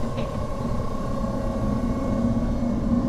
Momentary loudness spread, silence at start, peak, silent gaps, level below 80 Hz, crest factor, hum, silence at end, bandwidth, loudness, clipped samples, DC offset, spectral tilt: 5 LU; 0 s; -10 dBFS; none; -30 dBFS; 14 dB; none; 0 s; 12.5 kHz; -26 LUFS; under 0.1%; under 0.1%; -8 dB/octave